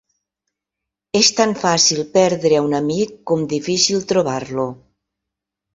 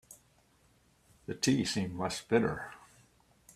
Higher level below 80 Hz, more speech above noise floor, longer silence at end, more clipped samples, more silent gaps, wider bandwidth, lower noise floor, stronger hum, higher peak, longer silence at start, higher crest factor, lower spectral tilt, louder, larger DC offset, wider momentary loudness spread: first, -58 dBFS vs -64 dBFS; first, 66 dB vs 36 dB; first, 1 s vs 0.8 s; neither; neither; second, 8 kHz vs 15 kHz; first, -83 dBFS vs -67 dBFS; neither; first, 0 dBFS vs -14 dBFS; first, 1.15 s vs 0.1 s; about the same, 18 dB vs 22 dB; second, -3 dB/octave vs -4.5 dB/octave; first, -17 LUFS vs -32 LUFS; neither; second, 9 LU vs 18 LU